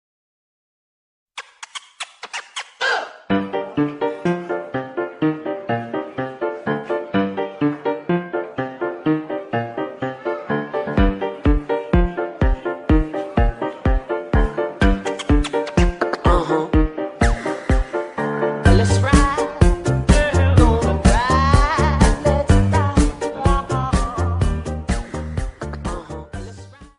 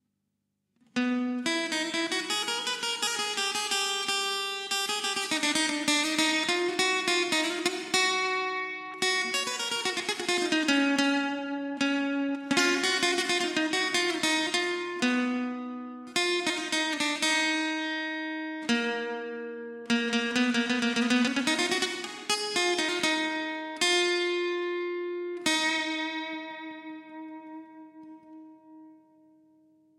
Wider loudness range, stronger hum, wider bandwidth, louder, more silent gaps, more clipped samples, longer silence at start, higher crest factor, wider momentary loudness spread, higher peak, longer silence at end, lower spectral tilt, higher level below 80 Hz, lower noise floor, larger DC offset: first, 8 LU vs 4 LU; neither; second, 11 kHz vs 16 kHz; first, -20 LUFS vs -27 LUFS; neither; neither; first, 1.35 s vs 0.95 s; about the same, 18 dB vs 20 dB; first, 13 LU vs 10 LU; first, -2 dBFS vs -10 dBFS; second, 0.15 s vs 1.05 s; first, -6.5 dB/octave vs -1 dB/octave; first, -24 dBFS vs -80 dBFS; second, -39 dBFS vs -80 dBFS; neither